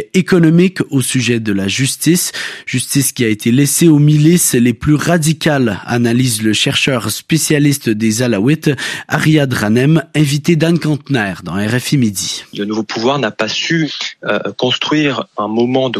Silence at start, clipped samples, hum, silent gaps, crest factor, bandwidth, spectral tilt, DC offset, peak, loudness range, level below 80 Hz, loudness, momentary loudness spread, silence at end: 0 s; under 0.1%; none; none; 14 dB; 15 kHz; -4.5 dB/octave; under 0.1%; 0 dBFS; 4 LU; -48 dBFS; -13 LUFS; 9 LU; 0 s